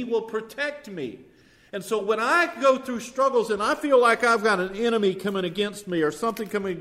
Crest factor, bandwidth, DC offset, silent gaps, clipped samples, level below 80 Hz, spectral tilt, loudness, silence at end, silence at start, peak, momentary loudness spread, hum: 18 dB; 15.5 kHz; under 0.1%; none; under 0.1%; -64 dBFS; -4.5 dB/octave; -23 LUFS; 0 s; 0 s; -6 dBFS; 13 LU; none